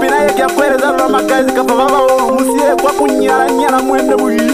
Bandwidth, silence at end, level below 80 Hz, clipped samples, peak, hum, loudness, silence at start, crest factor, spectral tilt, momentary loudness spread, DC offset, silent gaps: 16 kHz; 0 s; -40 dBFS; under 0.1%; -2 dBFS; none; -11 LUFS; 0 s; 10 dB; -3.5 dB/octave; 2 LU; under 0.1%; none